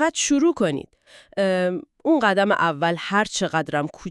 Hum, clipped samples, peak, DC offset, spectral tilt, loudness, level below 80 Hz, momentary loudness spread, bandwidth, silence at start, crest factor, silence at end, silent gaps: none; under 0.1%; -4 dBFS; under 0.1%; -4 dB/octave; -21 LUFS; -60 dBFS; 8 LU; 12 kHz; 0 s; 18 dB; 0 s; none